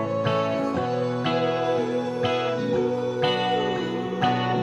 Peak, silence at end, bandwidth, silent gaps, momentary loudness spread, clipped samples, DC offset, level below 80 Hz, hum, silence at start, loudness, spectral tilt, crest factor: -8 dBFS; 0 s; 10.5 kHz; none; 2 LU; under 0.1%; under 0.1%; -62 dBFS; none; 0 s; -24 LUFS; -6.5 dB/octave; 16 dB